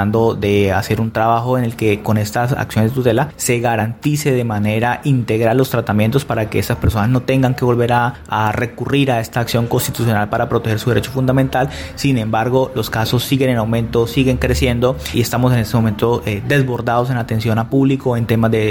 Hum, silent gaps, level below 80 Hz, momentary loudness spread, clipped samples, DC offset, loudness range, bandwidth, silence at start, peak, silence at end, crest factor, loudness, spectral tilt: none; none; -36 dBFS; 3 LU; under 0.1%; under 0.1%; 1 LU; 17 kHz; 0 s; -2 dBFS; 0 s; 14 dB; -16 LUFS; -6 dB/octave